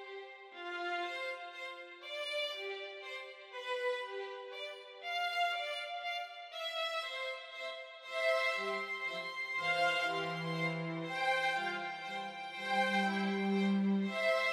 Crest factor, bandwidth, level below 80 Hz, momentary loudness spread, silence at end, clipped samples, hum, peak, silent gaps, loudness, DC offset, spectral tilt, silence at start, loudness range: 16 dB; 14.5 kHz; under -90 dBFS; 13 LU; 0 s; under 0.1%; none; -20 dBFS; none; -36 LUFS; under 0.1%; -5 dB/octave; 0 s; 6 LU